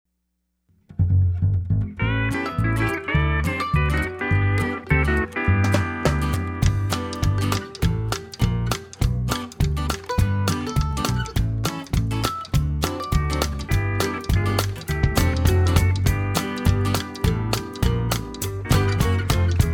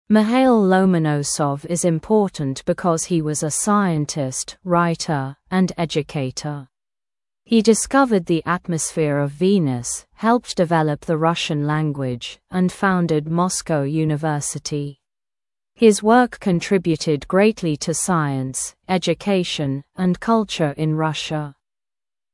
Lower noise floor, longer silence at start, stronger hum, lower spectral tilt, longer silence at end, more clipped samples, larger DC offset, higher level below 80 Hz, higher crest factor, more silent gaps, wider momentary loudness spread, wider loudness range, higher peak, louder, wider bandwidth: second, -74 dBFS vs under -90 dBFS; first, 0.9 s vs 0.1 s; neither; about the same, -5.5 dB/octave vs -5 dB/octave; second, 0 s vs 0.8 s; neither; neither; first, -28 dBFS vs -52 dBFS; about the same, 20 dB vs 18 dB; neither; second, 5 LU vs 9 LU; about the same, 3 LU vs 3 LU; about the same, -2 dBFS vs -2 dBFS; second, -23 LUFS vs -20 LUFS; first, 18.5 kHz vs 12 kHz